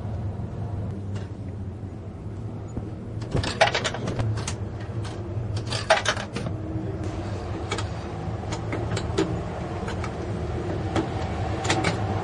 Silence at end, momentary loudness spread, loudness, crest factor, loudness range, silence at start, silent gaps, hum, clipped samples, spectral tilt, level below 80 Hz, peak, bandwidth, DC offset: 0 s; 13 LU; -28 LUFS; 24 dB; 4 LU; 0 s; none; none; under 0.1%; -5 dB/octave; -42 dBFS; -4 dBFS; 11.5 kHz; under 0.1%